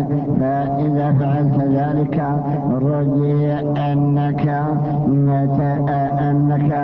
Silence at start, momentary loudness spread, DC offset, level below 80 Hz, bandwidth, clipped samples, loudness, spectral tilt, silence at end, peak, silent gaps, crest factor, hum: 0 s; 3 LU; under 0.1%; -44 dBFS; 4 kHz; under 0.1%; -18 LUFS; -12 dB/octave; 0 s; -6 dBFS; none; 12 dB; none